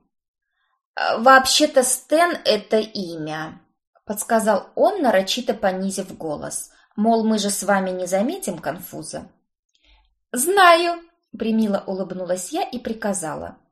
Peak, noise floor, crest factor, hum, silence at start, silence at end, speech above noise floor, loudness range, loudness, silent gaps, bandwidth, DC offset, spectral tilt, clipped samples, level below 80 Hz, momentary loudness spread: 0 dBFS; -58 dBFS; 20 dB; none; 0.95 s; 0.2 s; 38 dB; 5 LU; -20 LUFS; 3.87-3.93 s, 9.59-9.69 s; 13 kHz; under 0.1%; -3 dB/octave; under 0.1%; -58 dBFS; 17 LU